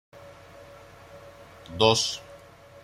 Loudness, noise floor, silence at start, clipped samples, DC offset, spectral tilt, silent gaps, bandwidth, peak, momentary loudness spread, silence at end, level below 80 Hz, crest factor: -24 LUFS; -49 dBFS; 0.15 s; under 0.1%; under 0.1%; -3 dB/octave; none; 14.5 kHz; -4 dBFS; 27 LU; 0.45 s; -60 dBFS; 26 dB